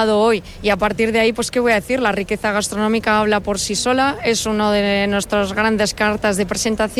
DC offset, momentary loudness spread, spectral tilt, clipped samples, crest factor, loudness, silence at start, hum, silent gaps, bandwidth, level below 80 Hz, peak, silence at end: under 0.1%; 3 LU; -3.5 dB/octave; under 0.1%; 14 dB; -17 LUFS; 0 s; none; none; 15.5 kHz; -40 dBFS; -4 dBFS; 0 s